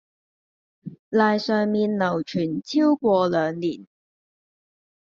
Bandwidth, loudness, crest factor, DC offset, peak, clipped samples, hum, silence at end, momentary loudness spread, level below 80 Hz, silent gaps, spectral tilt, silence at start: 7.4 kHz; -22 LUFS; 18 dB; under 0.1%; -6 dBFS; under 0.1%; none; 1.35 s; 17 LU; -68 dBFS; 0.99-1.11 s; -5 dB/octave; 0.85 s